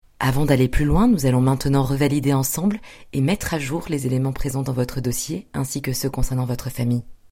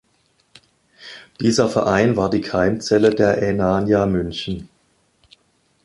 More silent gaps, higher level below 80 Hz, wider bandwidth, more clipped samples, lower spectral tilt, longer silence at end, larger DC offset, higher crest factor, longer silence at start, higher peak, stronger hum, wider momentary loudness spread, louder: neither; first, -32 dBFS vs -44 dBFS; first, 16.5 kHz vs 11.5 kHz; neither; about the same, -6 dB/octave vs -6 dB/octave; second, 0.15 s vs 1.2 s; neither; about the same, 18 dB vs 18 dB; second, 0.2 s vs 1 s; about the same, -2 dBFS vs -2 dBFS; neither; second, 8 LU vs 13 LU; second, -22 LUFS vs -18 LUFS